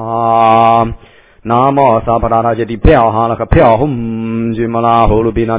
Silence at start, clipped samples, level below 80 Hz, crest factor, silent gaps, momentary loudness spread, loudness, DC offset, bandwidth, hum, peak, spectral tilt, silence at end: 0 s; 0.7%; -24 dBFS; 10 dB; none; 8 LU; -11 LUFS; 0.3%; 4 kHz; none; 0 dBFS; -11 dB/octave; 0 s